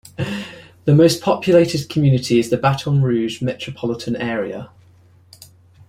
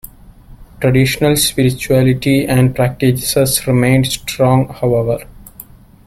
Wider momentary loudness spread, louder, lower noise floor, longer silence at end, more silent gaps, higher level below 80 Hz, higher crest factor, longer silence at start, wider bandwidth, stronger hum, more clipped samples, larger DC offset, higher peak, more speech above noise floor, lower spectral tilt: first, 12 LU vs 4 LU; second, -18 LUFS vs -14 LUFS; first, -50 dBFS vs -39 dBFS; first, 1.25 s vs 0.45 s; neither; second, -50 dBFS vs -36 dBFS; about the same, 18 dB vs 14 dB; second, 0.2 s vs 0.5 s; about the same, 15 kHz vs 16 kHz; neither; neither; neither; about the same, -2 dBFS vs -2 dBFS; first, 33 dB vs 26 dB; first, -6.5 dB/octave vs -5 dB/octave